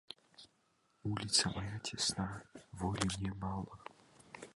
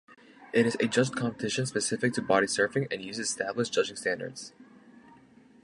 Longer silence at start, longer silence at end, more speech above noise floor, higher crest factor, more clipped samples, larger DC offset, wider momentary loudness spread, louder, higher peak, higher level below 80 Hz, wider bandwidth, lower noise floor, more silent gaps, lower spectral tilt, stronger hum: about the same, 0.1 s vs 0.1 s; second, 0.05 s vs 0.65 s; first, 37 dB vs 28 dB; about the same, 24 dB vs 22 dB; neither; neither; first, 22 LU vs 8 LU; second, -37 LUFS vs -29 LUFS; second, -16 dBFS vs -8 dBFS; first, -58 dBFS vs -68 dBFS; about the same, 11.5 kHz vs 11.5 kHz; first, -76 dBFS vs -57 dBFS; neither; about the same, -3 dB/octave vs -4 dB/octave; neither